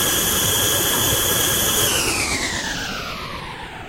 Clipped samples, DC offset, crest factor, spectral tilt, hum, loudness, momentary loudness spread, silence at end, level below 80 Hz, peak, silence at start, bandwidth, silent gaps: under 0.1%; under 0.1%; 16 dB; -1.5 dB/octave; none; -18 LUFS; 12 LU; 0 s; -38 dBFS; -6 dBFS; 0 s; 16 kHz; none